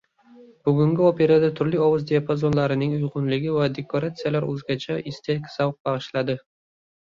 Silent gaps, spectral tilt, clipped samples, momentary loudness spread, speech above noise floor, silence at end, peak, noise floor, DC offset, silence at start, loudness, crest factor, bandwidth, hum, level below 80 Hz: 5.80-5.85 s; -8 dB/octave; under 0.1%; 10 LU; 28 dB; 0.75 s; -6 dBFS; -50 dBFS; under 0.1%; 0.4 s; -23 LUFS; 16 dB; 7.4 kHz; none; -58 dBFS